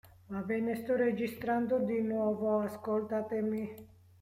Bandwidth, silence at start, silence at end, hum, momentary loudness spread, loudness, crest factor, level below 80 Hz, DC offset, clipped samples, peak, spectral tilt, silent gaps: 16 kHz; 0.05 s; 0.35 s; none; 9 LU; -33 LUFS; 12 dB; -70 dBFS; under 0.1%; under 0.1%; -20 dBFS; -7.5 dB/octave; none